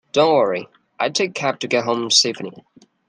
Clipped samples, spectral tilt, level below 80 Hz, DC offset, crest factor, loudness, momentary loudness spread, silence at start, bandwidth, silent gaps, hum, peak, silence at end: under 0.1%; -2.5 dB/octave; -68 dBFS; under 0.1%; 18 dB; -18 LUFS; 12 LU; 0.15 s; 11 kHz; none; none; -2 dBFS; 0.5 s